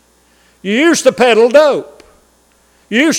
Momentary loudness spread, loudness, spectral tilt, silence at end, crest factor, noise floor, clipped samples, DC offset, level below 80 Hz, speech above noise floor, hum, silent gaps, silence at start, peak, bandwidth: 11 LU; -11 LUFS; -3 dB/octave; 0 s; 12 dB; -52 dBFS; under 0.1%; under 0.1%; -56 dBFS; 42 dB; none; none; 0.65 s; 0 dBFS; 17 kHz